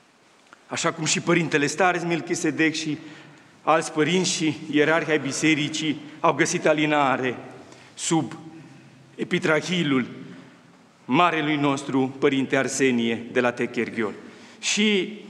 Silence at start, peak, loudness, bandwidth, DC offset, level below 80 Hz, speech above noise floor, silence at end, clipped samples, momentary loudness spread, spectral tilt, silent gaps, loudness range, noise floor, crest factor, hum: 0.7 s; -4 dBFS; -23 LUFS; 12 kHz; under 0.1%; -76 dBFS; 33 dB; 0 s; under 0.1%; 11 LU; -4 dB/octave; none; 4 LU; -56 dBFS; 20 dB; none